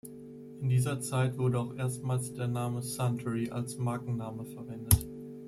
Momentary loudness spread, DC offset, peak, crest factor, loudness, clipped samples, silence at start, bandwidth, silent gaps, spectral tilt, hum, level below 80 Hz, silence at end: 14 LU; under 0.1%; -6 dBFS; 26 dB; -32 LUFS; under 0.1%; 0.05 s; 15.5 kHz; none; -6 dB/octave; none; -48 dBFS; 0 s